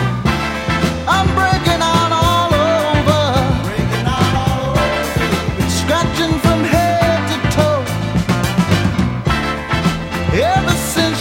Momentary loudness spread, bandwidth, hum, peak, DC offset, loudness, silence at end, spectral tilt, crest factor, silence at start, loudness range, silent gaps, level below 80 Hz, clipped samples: 4 LU; 17 kHz; none; 0 dBFS; under 0.1%; -15 LUFS; 0 s; -5 dB/octave; 14 dB; 0 s; 2 LU; none; -28 dBFS; under 0.1%